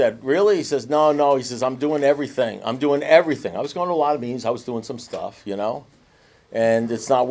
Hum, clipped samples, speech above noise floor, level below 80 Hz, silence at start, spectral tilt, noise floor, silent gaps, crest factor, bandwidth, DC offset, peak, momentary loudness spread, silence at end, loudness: none; under 0.1%; 35 dB; -64 dBFS; 0 s; -5 dB/octave; -55 dBFS; none; 20 dB; 8 kHz; under 0.1%; 0 dBFS; 14 LU; 0 s; -21 LUFS